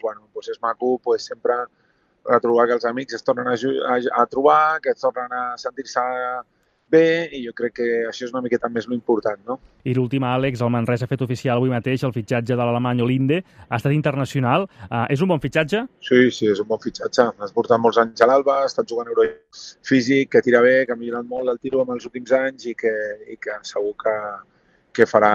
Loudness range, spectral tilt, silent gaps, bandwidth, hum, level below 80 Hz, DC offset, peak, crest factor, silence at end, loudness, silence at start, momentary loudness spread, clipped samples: 4 LU; -6.5 dB/octave; none; 9.8 kHz; none; -60 dBFS; under 0.1%; 0 dBFS; 20 dB; 0 s; -20 LUFS; 0.05 s; 11 LU; under 0.1%